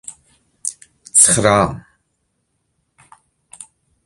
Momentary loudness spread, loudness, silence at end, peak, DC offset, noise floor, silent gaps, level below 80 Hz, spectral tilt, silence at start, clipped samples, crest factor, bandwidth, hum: 22 LU; -14 LUFS; 0.45 s; 0 dBFS; under 0.1%; -69 dBFS; none; -46 dBFS; -3 dB/octave; 0.1 s; under 0.1%; 20 dB; 16 kHz; none